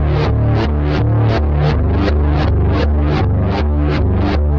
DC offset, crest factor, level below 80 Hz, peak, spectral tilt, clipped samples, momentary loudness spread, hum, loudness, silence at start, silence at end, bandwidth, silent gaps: under 0.1%; 10 dB; -18 dBFS; -2 dBFS; -9 dB/octave; under 0.1%; 1 LU; none; -15 LUFS; 0 s; 0 s; 6 kHz; none